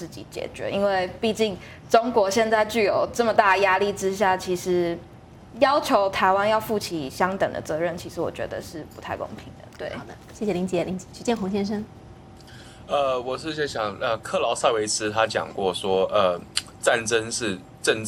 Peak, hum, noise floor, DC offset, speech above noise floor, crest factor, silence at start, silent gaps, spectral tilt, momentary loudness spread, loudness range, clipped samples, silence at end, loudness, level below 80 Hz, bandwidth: -2 dBFS; none; -45 dBFS; under 0.1%; 21 dB; 22 dB; 0 s; none; -4 dB/octave; 14 LU; 8 LU; under 0.1%; 0 s; -24 LUFS; -54 dBFS; 17.5 kHz